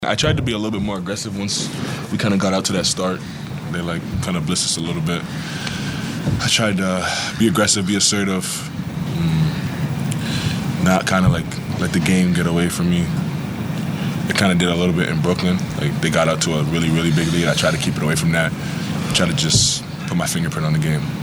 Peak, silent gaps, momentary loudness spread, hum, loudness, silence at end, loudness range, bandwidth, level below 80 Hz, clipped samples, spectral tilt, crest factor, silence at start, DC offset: 0 dBFS; none; 8 LU; none; -19 LUFS; 0 s; 3 LU; over 20 kHz; -40 dBFS; under 0.1%; -4.5 dB/octave; 18 dB; 0 s; under 0.1%